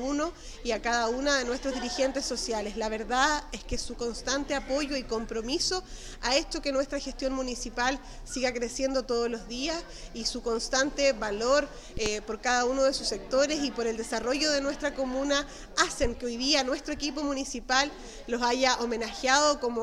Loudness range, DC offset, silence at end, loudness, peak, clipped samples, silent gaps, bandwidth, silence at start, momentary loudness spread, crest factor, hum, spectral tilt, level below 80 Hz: 3 LU; under 0.1%; 0 s; -29 LUFS; -6 dBFS; under 0.1%; none; 13.5 kHz; 0 s; 8 LU; 22 dB; none; -2 dB/octave; -44 dBFS